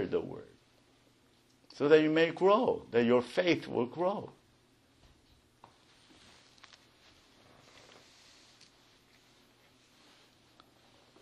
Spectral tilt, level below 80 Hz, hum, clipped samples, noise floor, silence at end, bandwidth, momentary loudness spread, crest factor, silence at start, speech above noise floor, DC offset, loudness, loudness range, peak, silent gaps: -6 dB/octave; -74 dBFS; none; under 0.1%; -67 dBFS; 6.9 s; 11 kHz; 16 LU; 24 dB; 0 s; 38 dB; under 0.1%; -29 LUFS; 12 LU; -10 dBFS; none